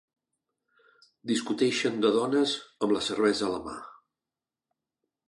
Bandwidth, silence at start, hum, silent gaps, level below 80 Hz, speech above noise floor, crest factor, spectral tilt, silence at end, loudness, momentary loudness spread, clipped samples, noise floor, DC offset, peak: 11.5 kHz; 1.25 s; none; none; -68 dBFS; over 63 dB; 20 dB; -4 dB/octave; 1.35 s; -27 LUFS; 12 LU; under 0.1%; under -90 dBFS; under 0.1%; -10 dBFS